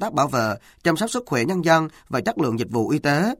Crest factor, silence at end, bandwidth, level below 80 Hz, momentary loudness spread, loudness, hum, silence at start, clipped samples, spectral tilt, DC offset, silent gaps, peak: 18 dB; 0.05 s; 16.5 kHz; -56 dBFS; 6 LU; -22 LUFS; none; 0 s; under 0.1%; -5.5 dB/octave; under 0.1%; none; -4 dBFS